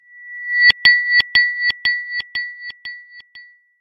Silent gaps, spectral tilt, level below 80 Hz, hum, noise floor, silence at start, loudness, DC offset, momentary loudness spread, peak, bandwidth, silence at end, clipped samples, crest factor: none; -1 dB/octave; -54 dBFS; none; -45 dBFS; 0.15 s; -14 LUFS; under 0.1%; 22 LU; 0 dBFS; 13.5 kHz; 0.4 s; under 0.1%; 18 dB